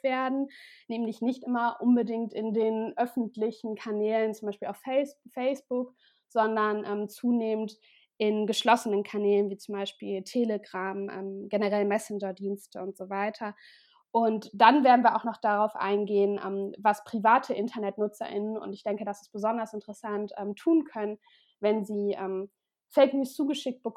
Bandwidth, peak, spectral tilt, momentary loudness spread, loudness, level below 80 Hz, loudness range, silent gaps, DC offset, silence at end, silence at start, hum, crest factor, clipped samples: 15 kHz; -6 dBFS; -5.5 dB/octave; 12 LU; -29 LUFS; -88 dBFS; 7 LU; none; under 0.1%; 0.05 s; 0.05 s; none; 22 dB; under 0.1%